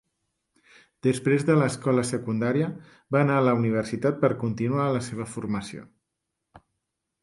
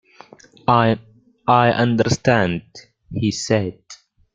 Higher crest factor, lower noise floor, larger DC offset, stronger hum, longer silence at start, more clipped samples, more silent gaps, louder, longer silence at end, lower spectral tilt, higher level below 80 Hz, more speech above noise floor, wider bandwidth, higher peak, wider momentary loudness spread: about the same, 18 dB vs 18 dB; first, -82 dBFS vs -46 dBFS; neither; neither; first, 1.05 s vs 0.7 s; neither; neither; second, -25 LUFS vs -19 LUFS; first, 0.65 s vs 0.4 s; first, -7 dB/octave vs -5.5 dB/octave; second, -60 dBFS vs -50 dBFS; first, 58 dB vs 29 dB; first, 11.5 kHz vs 9.2 kHz; second, -8 dBFS vs -2 dBFS; about the same, 11 LU vs 12 LU